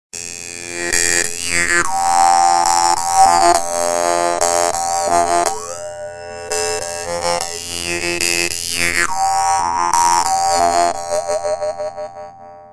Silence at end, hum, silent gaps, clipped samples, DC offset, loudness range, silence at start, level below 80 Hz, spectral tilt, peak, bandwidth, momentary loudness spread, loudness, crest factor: 0 s; none; none; under 0.1%; under 0.1%; 6 LU; 0.15 s; -46 dBFS; -1 dB/octave; 0 dBFS; 11 kHz; 14 LU; -16 LUFS; 16 dB